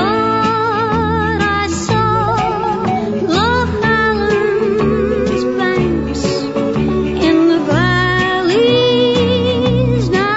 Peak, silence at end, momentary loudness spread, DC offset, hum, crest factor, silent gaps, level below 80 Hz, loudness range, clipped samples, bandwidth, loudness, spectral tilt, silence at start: -2 dBFS; 0 s; 5 LU; under 0.1%; none; 12 dB; none; -32 dBFS; 2 LU; under 0.1%; 8 kHz; -14 LUFS; -6 dB/octave; 0 s